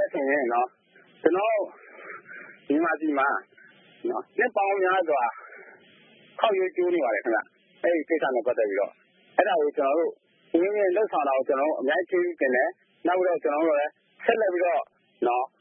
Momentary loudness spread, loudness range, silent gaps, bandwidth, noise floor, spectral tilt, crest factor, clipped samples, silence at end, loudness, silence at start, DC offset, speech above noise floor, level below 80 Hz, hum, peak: 9 LU; 3 LU; none; 3.7 kHz; -55 dBFS; -8.5 dB/octave; 22 dB; under 0.1%; 0.15 s; -25 LUFS; 0 s; under 0.1%; 31 dB; -86 dBFS; none; -4 dBFS